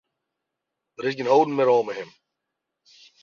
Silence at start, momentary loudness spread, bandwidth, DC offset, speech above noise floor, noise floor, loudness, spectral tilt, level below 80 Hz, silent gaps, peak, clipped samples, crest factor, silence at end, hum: 1 s; 15 LU; 7.2 kHz; under 0.1%; 62 dB; -83 dBFS; -22 LUFS; -6 dB/octave; -76 dBFS; none; -6 dBFS; under 0.1%; 20 dB; 1.2 s; none